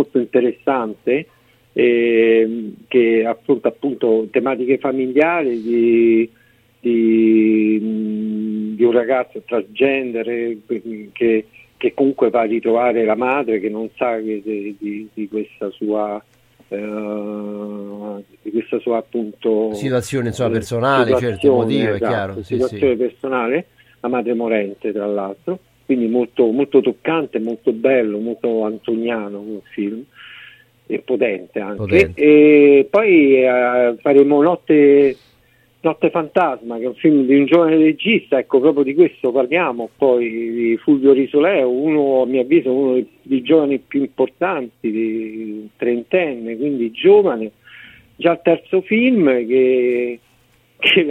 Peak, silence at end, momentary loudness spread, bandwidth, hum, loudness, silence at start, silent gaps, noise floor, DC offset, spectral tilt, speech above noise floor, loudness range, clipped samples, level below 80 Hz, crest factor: 0 dBFS; 0 s; 13 LU; 11 kHz; none; -17 LUFS; 0 s; none; -55 dBFS; under 0.1%; -7 dB/octave; 39 dB; 9 LU; under 0.1%; -56 dBFS; 16 dB